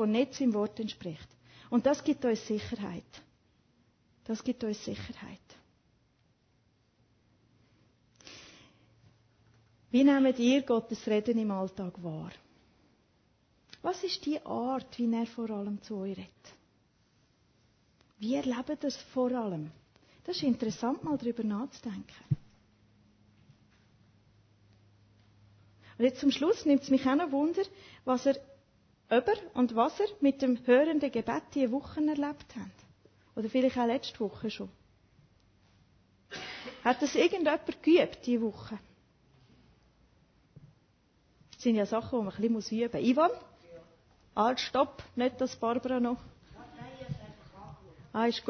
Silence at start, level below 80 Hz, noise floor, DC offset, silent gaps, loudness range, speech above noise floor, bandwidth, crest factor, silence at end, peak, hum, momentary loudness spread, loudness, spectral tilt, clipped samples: 0 s; -66 dBFS; -70 dBFS; under 0.1%; none; 11 LU; 40 dB; 6.6 kHz; 20 dB; 0 s; -12 dBFS; none; 18 LU; -31 LUFS; -5.5 dB/octave; under 0.1%